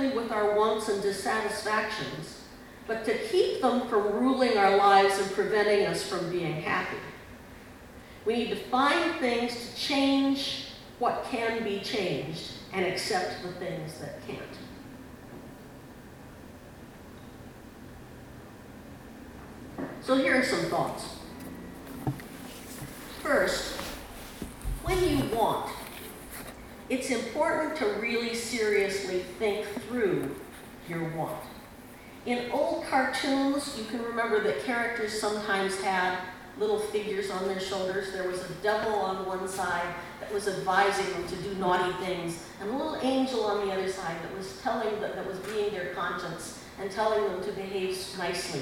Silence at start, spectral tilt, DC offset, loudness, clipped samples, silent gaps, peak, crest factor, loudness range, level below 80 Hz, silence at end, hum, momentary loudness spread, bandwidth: 0 s; -4 dB/octave; under 0.1%; -29 LUFS; under 0.1%; none; -8 dBFS; 22 dB; 9 LU; -52 dBFS; 0 s; none; 21 LU; 19.5 kHz